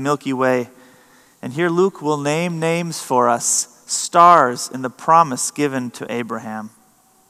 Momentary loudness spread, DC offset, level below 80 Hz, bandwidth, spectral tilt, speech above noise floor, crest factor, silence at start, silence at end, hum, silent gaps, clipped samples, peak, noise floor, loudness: 15 LU; under 0.1%; -72 dBFS; 15 kHz; -4 dB/octave; 37 dB; 18 dB; 0 s; 0.6 s; none; none; 0.1%; 0 dBFS; -55 dBFS; -17 LUFS